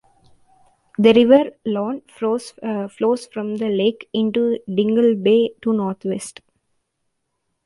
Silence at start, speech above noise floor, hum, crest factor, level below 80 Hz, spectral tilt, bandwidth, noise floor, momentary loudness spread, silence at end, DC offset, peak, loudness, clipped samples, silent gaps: 1 s; 55 dB; none; 18 dB; -64 dBFS; -6 dB/octave; 11.5 kHz; -73 dBFS; 12 LU; 1.35 s; under 0.1%; -2 dBFS; -19 LUFS; under 0.1%; none